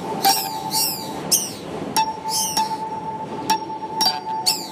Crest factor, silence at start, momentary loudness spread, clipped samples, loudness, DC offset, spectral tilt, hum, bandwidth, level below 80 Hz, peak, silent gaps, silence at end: 20 dB; 0 s; 10 LU; under 0.1%; -21 LUFS; under 0.1%; -1.5 dB/octave; none; 15.5 kHz; -58 dBFS; -4 dBFS; none; 0 s